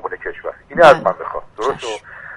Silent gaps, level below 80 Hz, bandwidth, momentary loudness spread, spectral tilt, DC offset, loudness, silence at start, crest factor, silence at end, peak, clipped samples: none; -46 dBFS; 11.5 kHz; 18 LU; -4.5 dB/octave; under 0.1%; -15 LUFS; 0.05 s; 16 dB; 0 s; 0 dBFS; 0.2%